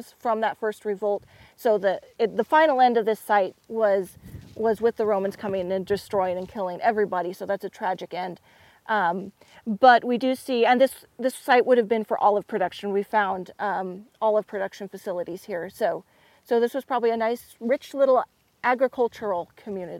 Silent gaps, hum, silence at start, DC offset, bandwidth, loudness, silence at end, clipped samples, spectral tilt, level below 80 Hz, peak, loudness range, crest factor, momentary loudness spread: none; none; 0 s; under 0.1%; 16.5 kHz; -24 LUFS; 0 s; under 0.1%; -5 dB/octave; -64 dBFS; -4 dBFS; 6 LU; 20 dB; 13 LU